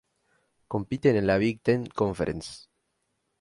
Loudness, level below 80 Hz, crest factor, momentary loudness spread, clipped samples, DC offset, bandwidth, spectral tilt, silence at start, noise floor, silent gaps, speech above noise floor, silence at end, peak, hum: -27 LUFS; -52 dBFS; 20 dB; 13 LU; under 0.1%; under 0.1%; 11.5 kHz; -7 dB/octave; 0.7 s; -77 dBFS; none; 51 dB; 0.8 s; -10 dBFS; none